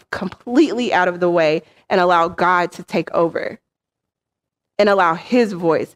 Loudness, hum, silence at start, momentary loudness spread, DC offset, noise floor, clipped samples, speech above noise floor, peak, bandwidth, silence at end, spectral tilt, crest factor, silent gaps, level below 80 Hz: -17 LUFS; none; 0.1 s; 10 LU; under 0.1%; -83 dBFS; under 0.1%; 66 dB; -4 dBFS; 12.5 kHz; 0.1 s; -6 dB/octave; 14 dB; none; -60 dBFS